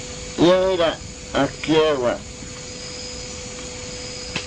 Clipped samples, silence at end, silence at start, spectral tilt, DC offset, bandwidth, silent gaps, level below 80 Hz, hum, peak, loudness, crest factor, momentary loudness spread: under 0.1%; 0 s; 0 s; -4 dB/octave; under 0.1%; 10.5 kHz; none; -42 dBFS; none; -4 dBFS; -22 LUFS; 18 dB; 15 LU